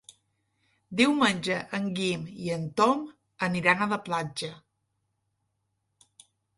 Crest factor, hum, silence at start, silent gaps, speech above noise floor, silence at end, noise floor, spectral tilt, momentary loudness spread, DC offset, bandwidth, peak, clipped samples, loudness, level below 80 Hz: 22 dB; none; 0.9 s; none; 51 dB; 2 s; -78 dBFS; -4.5 dB/octave; 11 LU; under 0.1%; 11.5 kHz; -8 dBFS; under 0.1%; -27 LUFS; -68 dBFS